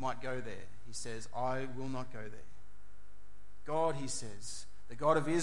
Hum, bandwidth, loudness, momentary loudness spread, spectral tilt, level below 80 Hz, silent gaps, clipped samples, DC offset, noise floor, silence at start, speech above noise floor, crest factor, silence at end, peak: none; 11.5 kHz; -38 LUFS; 19 LU; -5 dB/octave; -60 dBFS; none; under 0.1%; 2%; -61 dBFS; 0 s; 23 dB; 22 dB; 0 s; -16 dBFS